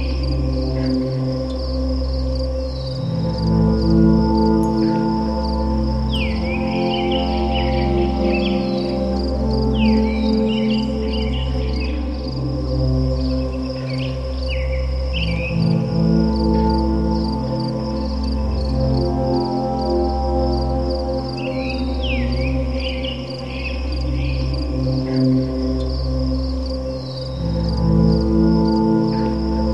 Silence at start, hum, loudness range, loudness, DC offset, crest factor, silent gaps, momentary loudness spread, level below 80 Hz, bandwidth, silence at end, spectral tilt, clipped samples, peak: 0 s; none; 4 LU; -20 LUFS; 0.4%; 14 dB; none; 7 LU; -24 dBFS; 7.4 kHz; 0 s; -8 dB/octave; under 0.1%; -4 dBFS